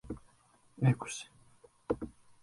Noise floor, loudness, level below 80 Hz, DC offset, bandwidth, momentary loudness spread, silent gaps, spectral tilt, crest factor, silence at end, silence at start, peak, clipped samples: -66 dBFS; -35 LUFS; -60 dBFS; under 0.1%; 11.5 kHz; 19 LU; none; -6.5 dB/octave; 22 dB; 0.35 s; 0.05 s; -16 dBFS; under 0.1%